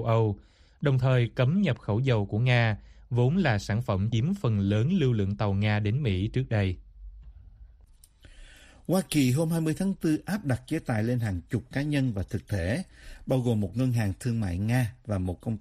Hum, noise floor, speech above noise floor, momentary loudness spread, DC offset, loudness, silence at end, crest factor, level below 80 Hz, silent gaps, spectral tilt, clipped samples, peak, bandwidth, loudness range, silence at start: none; -56 dBFS; 29 dB; 7 LU; under 0.1%; -27 LUFS; 0 s; 18 dB; -50 dBFS; none; -7 dB/octave; under 0.1%; -10 dBFS; 14.5 kHz; 5 LU; 0 s